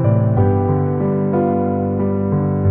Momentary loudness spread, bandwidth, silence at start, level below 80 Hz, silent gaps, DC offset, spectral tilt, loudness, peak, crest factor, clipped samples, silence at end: 3 LU; 3.2 kHz; 0 s; -44 dBFS; none; under 0.1%; -15 dB/octave; -17 LUFS; -4 dBFS; 12 dB; under 0.1%; 0 s